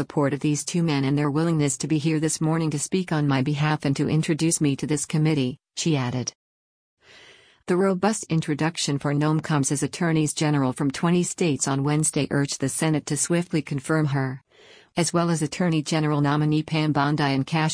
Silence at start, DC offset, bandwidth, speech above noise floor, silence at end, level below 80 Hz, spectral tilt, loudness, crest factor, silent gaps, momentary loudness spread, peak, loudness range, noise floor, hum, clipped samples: 0 s; under 0.1%; 10.5 kHz; 30 dB; 0 s; -60 dBFS; -5 dB/octave; -23 LUFS; 14 dB; 6.35-6.97 s; 4 LU; -10 dBFS; 3 LU; -52 dBFS; none; under 0.1%